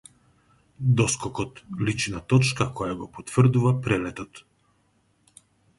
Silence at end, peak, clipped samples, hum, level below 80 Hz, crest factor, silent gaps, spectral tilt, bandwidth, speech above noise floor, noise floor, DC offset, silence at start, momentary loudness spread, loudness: 1.4 s; -6 dBFS; under 0.1%; none; -52 dBFS; 20 dB; none; -5.5 dB/octave; 11.5 kHz; 42 dB; -66 dBFS; under 0.1%; 0.8 s; 13 LU; -24 LUFS